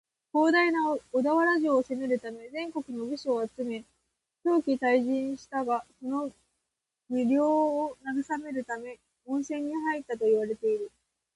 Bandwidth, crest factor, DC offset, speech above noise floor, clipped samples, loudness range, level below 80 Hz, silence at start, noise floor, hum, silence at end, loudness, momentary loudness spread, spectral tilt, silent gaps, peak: 11.5 kHz; 16 dB; under 0.1%; 57 dB; under 0.1%; 4 LU; -72 dBFS; 0.35 s; -85 dBFS; none; 0.45 s; -29 LUFS; 12 LU; -5 dB/octave; none; -12 dBFS